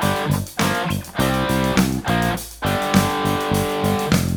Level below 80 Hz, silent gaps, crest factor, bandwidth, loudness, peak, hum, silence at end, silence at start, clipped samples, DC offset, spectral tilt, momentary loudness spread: -36 dBFS; none; 18 dB; over 20 kHz; -20 LUFS; -2 dBFS; none; 0 s; 0 s; under 0.1%; under 0.1%; -5 dB/octave; 5 LU